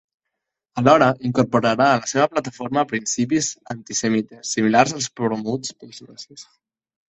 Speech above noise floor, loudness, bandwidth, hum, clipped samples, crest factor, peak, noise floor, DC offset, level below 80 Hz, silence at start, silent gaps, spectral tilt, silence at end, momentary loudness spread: 61 dB; -20 LUFS; 8.4 kHz; none; under 0.1%; 20 dB; 0 dBFS; -81 dBFS; under 0.1%; -60 dBFS; 0.75 s; none; -4.5 dB/octave; 0.75 s; 18 LU